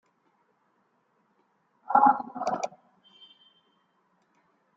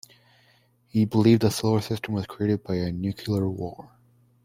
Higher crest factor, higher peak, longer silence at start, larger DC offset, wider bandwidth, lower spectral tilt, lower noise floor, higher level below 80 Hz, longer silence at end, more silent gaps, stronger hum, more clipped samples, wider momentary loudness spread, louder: about the same, 24 dB vs 20 dB; about the same, -6 dBFS vs -6 dBFS; first, 1.9 s vs 0.95 s; neither; second, 7.6 kHz vs 16 kHz; second, -4.5 dB/octave vs -7 dB/octave; first, -71 dBFS vs -62 dBFS; second, -78 dBFS vs -58 dBFS; first, 2.1 s vs 0.6 s; neither; neither; neither; about the same, 13 LU vs 11 LU; about the same, -25 LUFS vs -25 LUFS